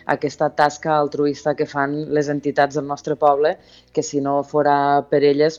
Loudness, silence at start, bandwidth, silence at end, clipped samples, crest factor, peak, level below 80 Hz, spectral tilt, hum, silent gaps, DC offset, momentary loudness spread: -19 LUFS; 0.05 s; 7.6 kHz; 0 s; under 0.1%; 16 dB; -4 dBFS; -62 dBFS; -5.5 dB/octave; none; none; under 0.1%; 7 LU